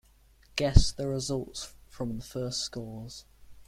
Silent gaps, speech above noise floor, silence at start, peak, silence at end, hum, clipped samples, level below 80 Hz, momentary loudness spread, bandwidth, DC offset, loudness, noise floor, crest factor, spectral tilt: none; 32 dB; 0.55 s; -4 dBFS; 0.15 s; none; under 0.1%; -34 dBFS; 18 LU; 14.5 kHz; under 0.1%; -31 LUFS; -60 dBFS; 26 dB; -5 dB/octave